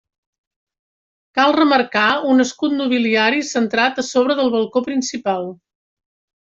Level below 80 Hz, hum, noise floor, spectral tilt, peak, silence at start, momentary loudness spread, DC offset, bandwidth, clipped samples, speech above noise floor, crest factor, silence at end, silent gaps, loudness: -64 dBFS; none; under -90 dBFS; -3.5 dB/octave; -2 dBFS; 1.35 s; 8 LU; under 0.1%; 7.8 kHz; under 0.1%; over 73 dB; 16 dB; 0.95 s; none; -17 LUFS